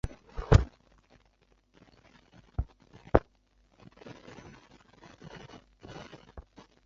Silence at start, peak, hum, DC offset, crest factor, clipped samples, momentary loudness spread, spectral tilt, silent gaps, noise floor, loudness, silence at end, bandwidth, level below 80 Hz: 0.05 s; -4 dBFS; none; under 0.1%; 30 dB; under 0.1%; 27 LU; -7 dB/octave; none; -67 dBFS; -30 LUFS; 0.45 s; 7.6 kHz; -40 dBFS